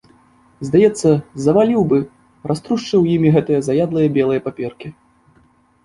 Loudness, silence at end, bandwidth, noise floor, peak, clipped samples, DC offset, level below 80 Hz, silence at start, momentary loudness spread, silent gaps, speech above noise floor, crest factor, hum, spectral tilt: -16 LUFS; 0.95 s; 11.5 kHz; -55 dBFS; -2 dBFS; under 0.1%; under 0.1%; -52 dBFS; 0.6 s; 16 LU; none; 39 dB; 14 dB; none; -7.5 dB/octave